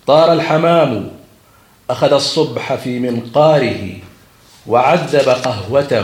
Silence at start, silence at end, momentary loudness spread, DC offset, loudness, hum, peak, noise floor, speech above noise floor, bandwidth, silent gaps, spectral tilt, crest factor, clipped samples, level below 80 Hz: 0.05 s; 0 s; 13 LU; under 0.1%; -14 LUFS; none; 0 dBFS; -48 dBFS; 35 dB; 16 kHz; none; -5.5 dB/octave; 14 dB; under 0.1%; -54 dBFS